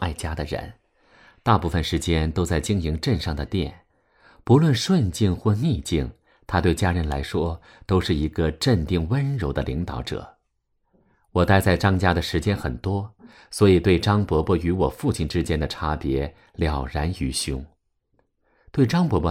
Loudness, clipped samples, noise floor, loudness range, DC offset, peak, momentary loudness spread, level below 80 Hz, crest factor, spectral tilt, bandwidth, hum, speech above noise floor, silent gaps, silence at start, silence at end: -23 LUFS; under 0.1%; -72 dBFS; 4 LU; under 0.1%; -4 dBFS; 11 LU; -36 dBFS; 20 dB; -6 dB/octave; 15.5 kHz; none; 50 dB; none; 0 s; 0 s